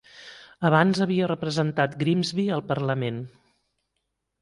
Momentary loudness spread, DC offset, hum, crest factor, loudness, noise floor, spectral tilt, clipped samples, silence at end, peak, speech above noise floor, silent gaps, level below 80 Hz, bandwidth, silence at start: 21 LU; under 0.1%; none; 20 dB; -24 LUFS; -79 dBFS; -6.5 dB/octave; under 0.1%; 1.15 s; -6 dBFS; 55 dB; none; -64 dBFS; 11.5 kHz; 0.15 s